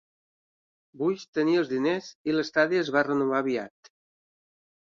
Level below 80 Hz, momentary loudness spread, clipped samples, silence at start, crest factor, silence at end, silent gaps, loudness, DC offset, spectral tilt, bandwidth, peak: -74 dBFS; 6 LU; under 0.1%; 0.95 s; 20 dB; 1.3 s; 1.28-1.33 s, 2.15-2.25 s; -26 LUFS; under 0.1%; -5.5 dB/octave; 7.4 kHz; -8 dBFS